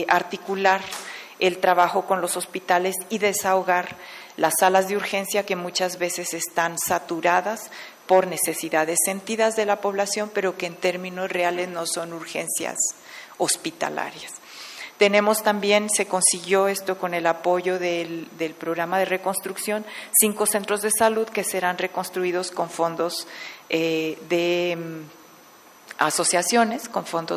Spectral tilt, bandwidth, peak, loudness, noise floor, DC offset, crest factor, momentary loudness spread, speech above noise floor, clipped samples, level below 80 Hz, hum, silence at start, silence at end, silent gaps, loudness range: -2.5 dB/octave; 16 kHz; -4 dBFS; -23 LUFS; -49 dBFS; under 0.1%; 18 dB; 12 LU; 26 dB; under 0.1%; -70 dBFS; none; 0 s; 0 s; none; 4 LU